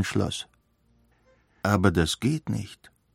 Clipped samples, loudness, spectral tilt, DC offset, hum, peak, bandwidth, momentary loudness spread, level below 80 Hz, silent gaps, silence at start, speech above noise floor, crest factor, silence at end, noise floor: under 0.1%; -26 LUFS; -5.5 dB/octave; under 0.1%; none; -6 dBFS; 16.5 kHz; 15 LU; -48 dBFS; none; 0 s; 40 dB; 22 dB; 0.4 s; -65 dBFS